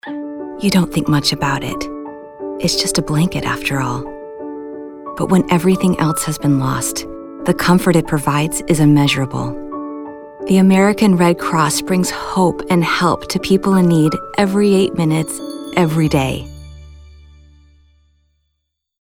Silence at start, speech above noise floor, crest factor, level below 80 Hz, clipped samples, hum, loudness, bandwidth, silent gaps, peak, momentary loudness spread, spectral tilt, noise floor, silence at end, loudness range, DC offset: 0.05 s; 59 dB; 16 dB; -40 dBFS; under 0.1%; none; -15 LUFS; 17.5 kHz; none; 0 dBFS; 16 LU; -5.5 dB/octave; -73 dBFS; 1.95 s; 5 LU; under 0.1%